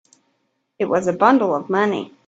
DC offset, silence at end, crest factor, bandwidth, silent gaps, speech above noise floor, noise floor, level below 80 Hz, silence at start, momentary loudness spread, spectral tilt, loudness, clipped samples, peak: under 0.1%; 0.2 s; 20 dB; 8 kHz; none; 52 dB; -70 dBFS; -64 dBFS; 0.8 s; 7 LU; -6 dB/octave; -18 LUFS; under 0.1%; 0 dBFS